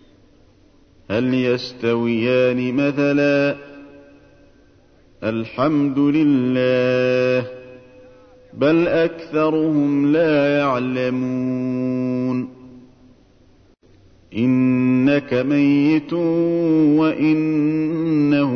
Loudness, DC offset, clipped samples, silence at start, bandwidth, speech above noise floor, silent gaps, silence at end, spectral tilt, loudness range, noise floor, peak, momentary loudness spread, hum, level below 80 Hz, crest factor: -18 LUFS; under 0.1%; under 0.1%; 1.1 s; 6.6 kHz; 35 dB; none; 0 s; -8 dB/octave; 5 LU; -52 dBFS; -4 dBFS; 6 LU; none; -56 dBFS; 14 dB